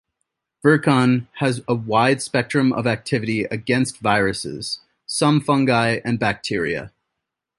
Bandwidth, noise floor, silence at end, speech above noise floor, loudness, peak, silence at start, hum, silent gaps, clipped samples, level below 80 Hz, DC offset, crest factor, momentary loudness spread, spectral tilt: 11.5 kHz; -81 dBFS; 0.7 s; 62 dB; -20 LUFS; -2 dBFS; 0.65 s; none; none; under 0.1%; -54 dBFS; under 0.1%; 18 dB; 9 LU; -5.5 dB/octave